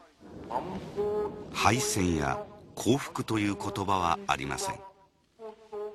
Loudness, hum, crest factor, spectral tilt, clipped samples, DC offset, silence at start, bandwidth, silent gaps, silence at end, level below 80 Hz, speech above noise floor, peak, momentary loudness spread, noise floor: -30 LUFS; none; 22 dB; -4.5 dB/octave; under 0.1%; under 0.1%; 0 s; 13.5 kHz; none; 0 s; -54 dBFS; 32 dB; -8 dBFS; 17 LU; -62 dBFS